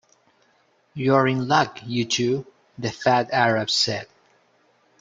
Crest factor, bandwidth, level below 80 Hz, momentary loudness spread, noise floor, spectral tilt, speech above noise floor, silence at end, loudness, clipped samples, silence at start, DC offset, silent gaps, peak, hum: 20 dB; 9.4 kHz; -64 dBFS; 11 LU; -63 dBFS; -4.5 dB/octave; 41 dB; 0.95 s; -22 LUFS; under 0.1%; 0.95 s; under 0.1%; none; -2 dBFS; none